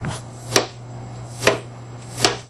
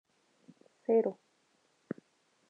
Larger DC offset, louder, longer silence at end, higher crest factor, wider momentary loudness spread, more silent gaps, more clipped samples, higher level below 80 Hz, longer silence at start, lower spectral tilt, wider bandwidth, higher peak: neither; first, -22 LUFS vs -32 LUFS; second, 0 s vs 1.35 s; about the same, 24 dB vs 20 dB; about the same, 16 LU vs 16 LU; neither; neither; first, -48 dBFS vs under -90 dBFS; second, 0 s vs 0.9 s; second, -3 dB/octave vs -8.5 dB/octave; first, 16 kHz vs 5 kHz; first, 0 dBFS vs -18 dBFS